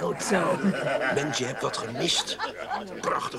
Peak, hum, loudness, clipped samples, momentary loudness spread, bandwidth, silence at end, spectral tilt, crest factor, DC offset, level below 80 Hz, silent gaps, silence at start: -8 dBFS; none; -27 LUFS; under 0.1%; 7 LU; 15.5 kHz; 0 s; -3.5 dB/octave; 20 dB; under 0.1%; -60 dBFS; none; 0 s